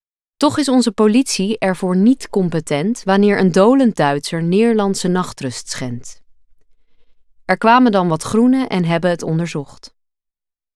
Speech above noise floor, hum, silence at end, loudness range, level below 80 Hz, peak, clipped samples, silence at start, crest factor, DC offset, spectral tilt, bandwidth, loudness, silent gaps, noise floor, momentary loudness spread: 70 dB; none; 1.1 s; 5 LU; -52 dBFS; -2 dBFS; under 0.1%; 0.4 s; 14 dB; under 0.1%; -5.5 dB/octave; 13 kHz; -16 LUFS; none; -85 dBFS; 13 LU